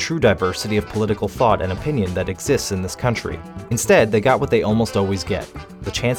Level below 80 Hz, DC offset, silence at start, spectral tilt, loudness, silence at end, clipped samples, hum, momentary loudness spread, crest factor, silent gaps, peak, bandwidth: -40 dBFS; under 0.1%; 0 s; -5 dB/octave; -20 LUFS; 0 s; under 0.1%; none; 10 LU; 18 dB; none; -2 dBFS; 18.5 kHz